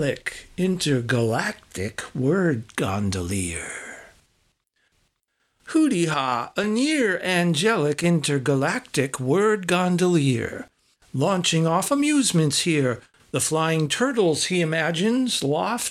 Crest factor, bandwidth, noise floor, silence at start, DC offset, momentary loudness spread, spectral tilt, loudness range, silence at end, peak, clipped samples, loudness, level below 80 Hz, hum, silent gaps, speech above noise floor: 16 dB; 14.5 kHz; -72 dBFS; 0 s; under 0.1%; 10 LU; -4.5 dB/octave; 6 LU; 0 s; -8 dBFS; under 0.1%; -22 LUFS; -56 dBFS; none; none; 50 dB